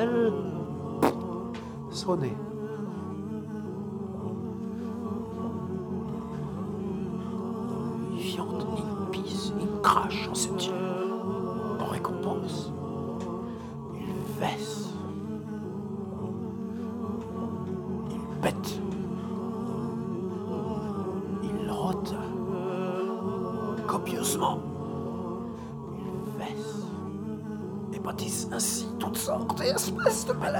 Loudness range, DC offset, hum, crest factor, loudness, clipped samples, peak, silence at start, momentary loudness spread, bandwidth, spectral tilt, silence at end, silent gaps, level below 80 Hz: 6 LU; under 0.1%; none; 24 dB; -32 LUFS; under 0.1%; -6 dBFS; 0 s; 9 LU; over 20 kHz; -5 dB/octave; 0 s; none; -56 dBFS